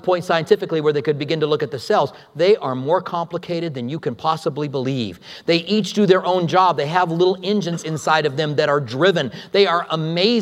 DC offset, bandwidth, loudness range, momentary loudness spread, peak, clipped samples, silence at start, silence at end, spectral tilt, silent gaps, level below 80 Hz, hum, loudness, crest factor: under 0.1%; 13.5 kHz; 4 LU; 9 LU; 0 dBFS; under 0.1%; 0.05 s; 0 s; -5.5 dB/octave; none; -66 dBFS; none; -19 LUFS; 18 dB